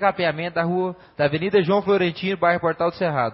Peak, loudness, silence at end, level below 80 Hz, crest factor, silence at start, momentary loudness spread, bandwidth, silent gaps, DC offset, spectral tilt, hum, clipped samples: -4 dBFS; -22 LUFS; 0 s; -58 dBFS; 18 dB; 0 s; 5 LU; 5.8 kHz; none; under 0.1%; -10.5 dB/octave; none; under 0.1%